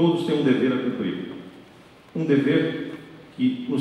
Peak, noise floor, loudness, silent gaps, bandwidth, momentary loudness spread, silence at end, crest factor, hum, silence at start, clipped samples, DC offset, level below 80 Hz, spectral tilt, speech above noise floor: -8 dBFS; -49 dBFS; -23 LUFS; none; 11 kHz; 20 LU; 0 s; 16 dB; none; 0 s; under 0.1%; under 0.1%; -66 dBFS; -7.5 dB/octave; 27 dB